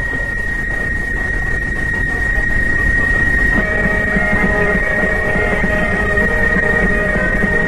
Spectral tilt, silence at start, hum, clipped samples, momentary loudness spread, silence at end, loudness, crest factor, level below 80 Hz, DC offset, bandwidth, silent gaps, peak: -6.5 dB/octave; 0 s; none; under 0.1%; 5 LU; 0 s; -15 LUFS; 14 dB; -22 dBFS; under 0.1%; 12.5 kHz; none; -2 dBFS